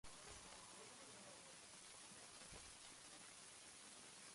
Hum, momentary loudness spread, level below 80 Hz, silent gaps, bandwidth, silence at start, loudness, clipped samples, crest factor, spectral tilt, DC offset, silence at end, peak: none; 1 LU; -78 dBFS; none; 11.5 kHz; 0.05 s; -58 LUFS; under 0.1%; 18 dB; -1 dB/octave; under 0.1%; 0 s; -42 dBFS